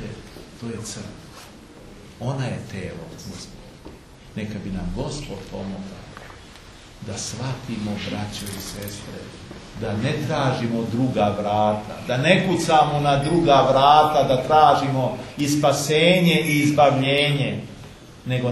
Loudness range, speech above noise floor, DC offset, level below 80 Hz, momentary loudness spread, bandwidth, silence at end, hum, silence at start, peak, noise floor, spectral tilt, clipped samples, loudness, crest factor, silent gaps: 16 LU; 23 dB; under 0.1%; -46 dBFS; 22 LU; 13.5 kHz; 0 s; none; 0 s; -2 dBFS; -43 dBFS; -5 dB/octave; under 0.1%; -20 LUFS; 20 dB; none